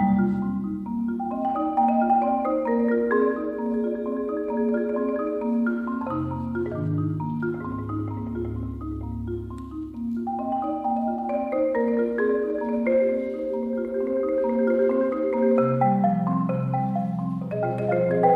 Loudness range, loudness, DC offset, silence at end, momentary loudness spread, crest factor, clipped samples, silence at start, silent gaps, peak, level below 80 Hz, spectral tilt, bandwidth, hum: 6 LU; -25 LUFS; under 0.1%; 0 s; 9 LU; 16 dB; under 0.1%; 0 s; none; -8 dBFS; -48 dBFS; -11 dB/octave; 4.3 kHz; none